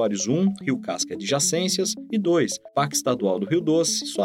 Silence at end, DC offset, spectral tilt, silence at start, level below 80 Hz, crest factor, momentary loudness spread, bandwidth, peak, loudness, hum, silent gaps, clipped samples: 0 s; under 0.1%; -4 dB/octave; 0 s; -68 dBFS; 14 dB; 5 LU; 16.5 kHz; -8 dBFS; -23 LUFS; none; none; under 0.1%